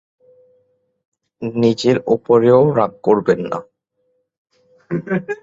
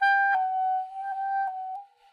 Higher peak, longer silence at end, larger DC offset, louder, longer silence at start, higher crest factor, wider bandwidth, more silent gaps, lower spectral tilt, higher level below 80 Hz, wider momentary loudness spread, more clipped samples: first, -2 dBFS vs -14 dBFS; second, 0.1 s vs 0.25 s; neither; first, -16 LUFS vs -27 LUFS; first, 1.4 s vs 0 s; about the same, 16 dB vs 14 dB; first, 7.8 kHz vs 6.6 kHz; first, 4.38-4.45 s vs none; first, -7 dB/octave vs 1 dB/octave; first, -58 dBFS vs -88 dBFS; about the same, 14 LU vs 14 LU; neither